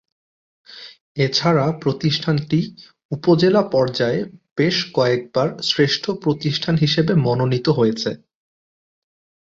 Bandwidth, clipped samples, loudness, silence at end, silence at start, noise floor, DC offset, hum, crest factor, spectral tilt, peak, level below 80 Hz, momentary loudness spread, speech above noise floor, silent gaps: 7.6 kHz; under 0.1%; -19 LUFS; 1.3 s; 0.7 s; under -90 dBFS; under 0.1%; none; 16 dB; -6 dB/octave; -2 dBFS; -56 dBFS; 11 LU; over 72 dB; 1.01-1.15 s, 3.05-3.09 s, 4.51-4.56 s